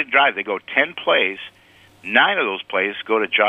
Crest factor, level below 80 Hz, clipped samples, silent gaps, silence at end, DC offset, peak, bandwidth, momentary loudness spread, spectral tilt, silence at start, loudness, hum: 20 dB; -70 dBFS; under 0.1%; none; 0 s; under 0.1%; 0 dBFS; 9.6 kHz; 11 LU; -4.5 dB/octave; 0 s; -19 LUFS; none